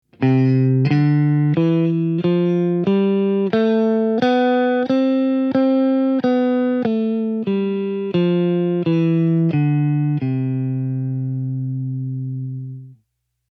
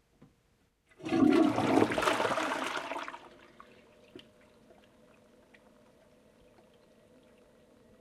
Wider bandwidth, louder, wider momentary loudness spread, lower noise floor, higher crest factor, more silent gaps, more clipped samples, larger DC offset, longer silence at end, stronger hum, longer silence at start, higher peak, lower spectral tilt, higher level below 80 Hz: second, 6.2 kHz vs 13.5 kHz; first, -18 LUFS vs -29 LUFS; second, 8 LU vs 18 LU; about the same, -70 dBFS vs -71 dBFS; second, 14 dB vs 24 dB; neither; neither; neither; second, 0.6 s vs 3.85 s; neither; second, 0.2 s vs 1 s; first, -4 dBFS vs -10 dBFS; first, -10 dB/octave vs -5 dB/octave; about the same, -68 dBFS vs -66 dBFS